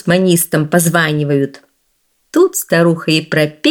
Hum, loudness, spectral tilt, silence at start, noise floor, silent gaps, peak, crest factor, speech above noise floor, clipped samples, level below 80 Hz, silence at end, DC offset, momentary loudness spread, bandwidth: none; -13 LUFS; -4.5 dB/octave; 0.05 s; -62 dBFS; none; 0 dBFS; 14 dB; 49 dB; under 0.1%; -58 dBFS; 0 s; under 0.1%; 5 LU; 18.5 kHz